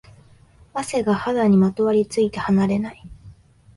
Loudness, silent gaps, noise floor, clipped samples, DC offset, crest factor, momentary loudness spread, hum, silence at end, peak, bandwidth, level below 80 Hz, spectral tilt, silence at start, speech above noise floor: -20 LUFS; none; -51 dBFS; under 0.1%; under 0.1%; 14 dB; 11 LU; none; 0.45 s; -8 dBFS; 11.5 kHz; -52 dBFS; -7 dB/octave; 0.75 s; 32 dB